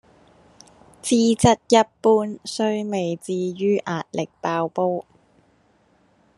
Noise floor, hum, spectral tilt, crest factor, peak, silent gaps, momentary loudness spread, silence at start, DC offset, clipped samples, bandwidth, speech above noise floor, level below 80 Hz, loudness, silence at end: -60 dBFS; none; -5 dB/octave; 20 dB; -2 dBFS; none; 11 LU; 1.05 s; under 0.1%; under 0.1%; 12.5 kHz; 40 dB; -54 dBFS; -21 LUFS; 1.35 s